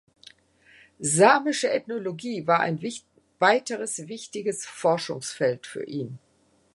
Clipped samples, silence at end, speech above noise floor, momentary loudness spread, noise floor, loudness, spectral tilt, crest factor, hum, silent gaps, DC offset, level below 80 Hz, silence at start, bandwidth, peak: under 0.1%; 0.6 s; 33 dB; 15 LU; -57 dBFS; -25 LUFS; -3.5 dB/octave; 24 dB; none; none; under 0.1%; -72 dBFS; 1 s; 11.5 kHz; -4 dBFS